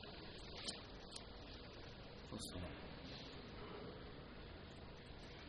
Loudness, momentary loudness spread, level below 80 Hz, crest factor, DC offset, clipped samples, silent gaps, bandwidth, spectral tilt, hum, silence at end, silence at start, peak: -53 LUFS; 7 LU; -62 dBFS; 22 dB; under 0.1%; under 0.1%; none; 9.4 kHz; -4 dB/octave; none; 0 s; 0 s; -32 dBFS